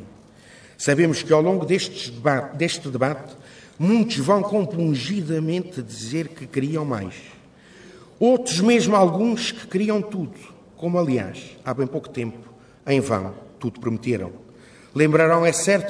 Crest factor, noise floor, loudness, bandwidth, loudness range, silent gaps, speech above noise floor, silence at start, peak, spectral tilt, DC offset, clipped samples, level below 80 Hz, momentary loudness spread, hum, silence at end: 18 dB; -48 dBFS; -22 LUFS; 11 kHz; 6 LU; none; 27 dB; 0 s; -4 dBFS; -5.5 dB/octave; under 0.1%; under 0.1%; -62 dBFS; 14 LU; none; 0 s